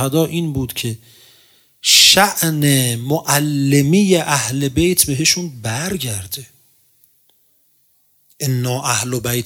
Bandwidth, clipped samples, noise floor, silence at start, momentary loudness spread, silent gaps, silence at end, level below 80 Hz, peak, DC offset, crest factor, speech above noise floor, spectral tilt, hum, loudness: 18 kHz; under 0.1%; -57 dBFS; 0 s; 14 LU; none; 0 s; -46 dBFS; 0 dBFS; under 0.1%; 18 dB; 41 dB; -3.5 dB/octave; none; -15 LUFS